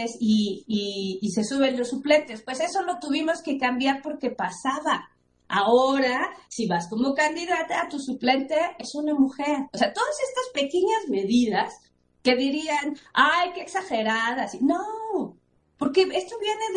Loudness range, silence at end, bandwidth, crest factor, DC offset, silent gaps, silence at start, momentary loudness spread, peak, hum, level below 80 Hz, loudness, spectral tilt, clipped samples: 2 LU; 0 s; 10.5 kHz; 20 dB; under 0.1%; none; 0 s; 7 LU; -6 dBFS; none; -64 dBFS; -25 LUFS; -4 dB/octave; under 0.1%